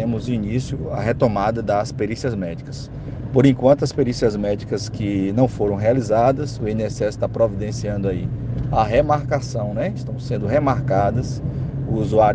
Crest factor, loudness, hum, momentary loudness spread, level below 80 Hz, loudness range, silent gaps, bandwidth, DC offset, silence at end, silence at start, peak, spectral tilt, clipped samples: 18 dB; -21 LUFS; none; 9 LU; -38 dBFS; 2 LU; none; 9.2 kHz; under 0.1%; 0 s; 0 s; -2 dBFS; -7.5 dB/octave; under 0.1%